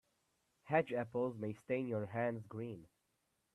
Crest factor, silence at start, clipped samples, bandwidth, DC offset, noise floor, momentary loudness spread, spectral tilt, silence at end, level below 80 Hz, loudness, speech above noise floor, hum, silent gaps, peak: 22 dB; 0.65 s; under 0.1%; 12 kHz; under 0.1%; -83 dBFS; 11 LU; -8.5 dB/octave; 0.7 s; -80 dBFS; -40 LUFS; 44 dB; none; none; -20 dBFS